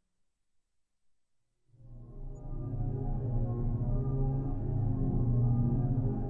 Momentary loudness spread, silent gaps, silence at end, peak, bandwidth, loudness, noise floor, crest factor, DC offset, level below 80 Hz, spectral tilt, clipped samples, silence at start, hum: 18 LU; none; 0 s; -18 dBFS; 1.9 kHz; -33 LUFS; -76 dBFS; 14 dB; under 0.1%; -38 dBFS; -13.5 dB/octave; under 0.1%; 1.8 s; none